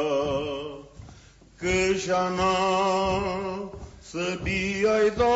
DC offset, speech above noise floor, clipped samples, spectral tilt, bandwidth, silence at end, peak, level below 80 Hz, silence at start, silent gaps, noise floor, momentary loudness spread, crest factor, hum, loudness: under 0.1%; 27 dB; under 0.1%; -4.5 dB/octave; 8 kHz; 0 s; -12 dBFS; -46 dBFS; 0 s; none; -51 dBFS; 14 LU; 12 dB; none; -25 LUFS